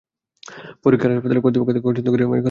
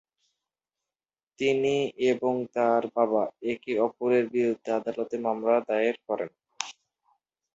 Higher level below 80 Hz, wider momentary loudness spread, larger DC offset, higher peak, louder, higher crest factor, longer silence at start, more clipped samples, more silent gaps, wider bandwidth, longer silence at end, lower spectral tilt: first, -56 dBFS vs -72 dBFS; about the same, 7 LU vs 8 LU; neither; first, -2 dBFS vs -6 dBFS; first, -18 LUFS vs -27 LUFS; second, 16 dB vs 22 dB; second, 0.5 s vs 1.4 s; neither; neither; second, 7 kHz vs 8 kHz; second, 0 s vs 0.85 s; first, -8.5 dB/octave vs -5 dB/octave